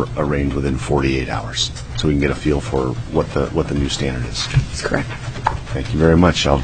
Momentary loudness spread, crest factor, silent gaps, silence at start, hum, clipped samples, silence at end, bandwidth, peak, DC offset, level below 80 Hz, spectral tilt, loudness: 8 LU; 18 dB; none; 0 s; none; under 0.1%; 0 s; 9.6 kHz; 0 dBFS; under 0.1%; -28 dBFS; -5.5 dB/octave; -19 LUFS